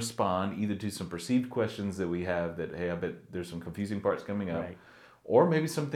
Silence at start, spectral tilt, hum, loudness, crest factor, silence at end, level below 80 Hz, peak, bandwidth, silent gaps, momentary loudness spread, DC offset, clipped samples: 0 s; -6 dB/octave; none; -31 LUFS; 22 dB; 0 s; -66 dBFS; -10 dBFS; 16 kHz; none; 12 LU; under 0.1%; under 0.1%